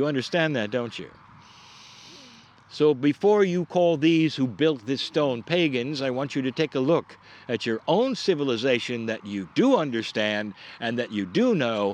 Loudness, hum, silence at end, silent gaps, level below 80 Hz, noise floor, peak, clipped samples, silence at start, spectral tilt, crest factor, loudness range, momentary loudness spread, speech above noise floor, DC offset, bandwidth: -24 LUFS; none; 0 s; none; -72 dBFS; -51 dBFS; -8 dBFS; under 0.1%; 0 s; -6 dB/octave; 16 dB; 3 LU; 11 LU; 27 dB; under 0.1%; 9.6 kHz